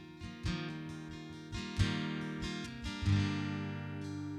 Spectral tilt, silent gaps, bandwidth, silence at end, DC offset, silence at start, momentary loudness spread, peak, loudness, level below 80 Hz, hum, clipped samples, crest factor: -6 dB/octave; none; 11 kHz; 0 s; under 0.1%; 0 s; 12 LU; -18 dBFS; -38 LUFS; -50 dBFS; none; under 0.1%; 20 dB